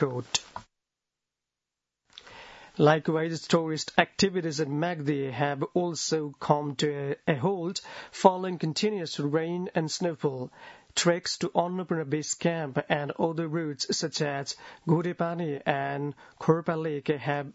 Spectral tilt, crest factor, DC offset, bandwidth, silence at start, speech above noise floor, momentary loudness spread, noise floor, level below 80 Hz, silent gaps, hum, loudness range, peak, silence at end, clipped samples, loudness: -4.5 dB/octave; 26 dB; under 0.1%; 8 kHz; 0 s; 60 dB; 9 LU; -88 dBFS; -68 dBFS; none; none; 3 LU; -2 dBFS; 0.05 s; under 0.1%; -28 LUFS